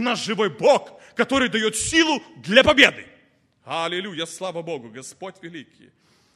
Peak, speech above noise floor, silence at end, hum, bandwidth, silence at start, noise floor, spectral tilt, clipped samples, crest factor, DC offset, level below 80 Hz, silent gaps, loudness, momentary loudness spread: 0 dBFS; 39 dB; 0.75 s; none; 13 kHz; 0 s; -60 dBFS; -3 dB/octave; under 0.1%; 22 dB; under 0.1%; -52 dBFS; none; -20 LUFS; 22 LU